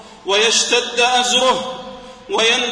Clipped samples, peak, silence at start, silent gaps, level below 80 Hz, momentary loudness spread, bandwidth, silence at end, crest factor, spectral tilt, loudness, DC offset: under 0.1%; -2 dBFS; 0 s; none; -54 dBFS; 14 LU; 10.5 kHz; 0 s; 16 dB; 0 dB/octave; -15 LUFS; under 0.1%